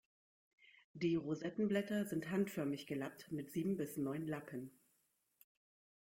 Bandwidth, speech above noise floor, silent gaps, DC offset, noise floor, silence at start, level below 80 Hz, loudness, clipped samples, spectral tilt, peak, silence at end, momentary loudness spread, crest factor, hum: 16.5 kHz; 41 dB; 0.84-0.94 s; under 0.1%; -81 dBFS; 0.65 s; -78 dBFS; -41 LUFS; under 0.1%; -6.5 dB/octave; -24 dBFS; 1.35 s; 9 LU; 18 dB; none